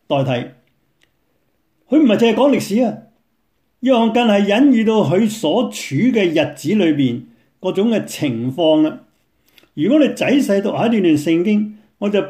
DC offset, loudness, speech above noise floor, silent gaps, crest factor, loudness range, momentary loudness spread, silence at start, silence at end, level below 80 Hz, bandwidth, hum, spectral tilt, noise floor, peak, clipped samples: under 0.1%; -16 LUFS; 52 dB; none; 14 dB; 3 LU; 9 LU; 0.1 s; 0 s; -62 dBFS; 15.5 kHz; none; -6 dB/octave; -67 dBFS; -2 dBFS; under 0.1%